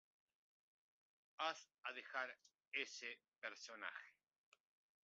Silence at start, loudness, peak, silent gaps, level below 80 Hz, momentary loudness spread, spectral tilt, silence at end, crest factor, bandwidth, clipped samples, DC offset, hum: 1.4 s; -49 LUFS; -30 dBFS; 2.67-2.71 s, 3.28-3.32 s, 3.38-3.42 s; under -90 dBFS; 12 LU; 3 dB/octave; 0.95 s; 24 dB; 7.4 kHz; under 0.1%; under 0.1%; none